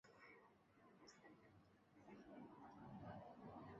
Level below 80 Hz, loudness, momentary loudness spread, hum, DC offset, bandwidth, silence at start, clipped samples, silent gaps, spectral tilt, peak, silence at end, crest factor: -82 dBFS; -62 LUFS; 10 LU; none; under 0.1%; 7.4 kHz; 0.05 s; under 0.1%; none; -6 dB/octave; -46 dBFS; 0 s; 16 dB